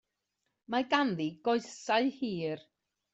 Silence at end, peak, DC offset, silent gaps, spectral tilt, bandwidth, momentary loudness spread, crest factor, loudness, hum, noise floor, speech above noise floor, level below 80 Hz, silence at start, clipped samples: 0.55 s; -12 dBFS; under 0.1%; none; -5 dB/octave; 8.2 kHz; 8 LU; 22 dB; -32 LUFS; none; -84 dBFS; 52 dB; -76 dBFS; 0.7 s; under 0.1%